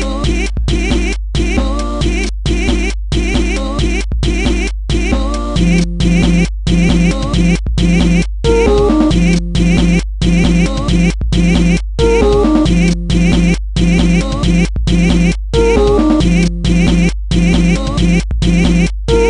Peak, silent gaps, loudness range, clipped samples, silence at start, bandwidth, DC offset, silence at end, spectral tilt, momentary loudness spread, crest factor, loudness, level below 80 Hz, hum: 0 dBFS; none; 4 LU; under 0.1%; 0 s; 10.5 kHz; under 0.1%; 0 s; -6 dB/octave; 6 LU; 12 dB; -13 LUFS; -16 dBFS; none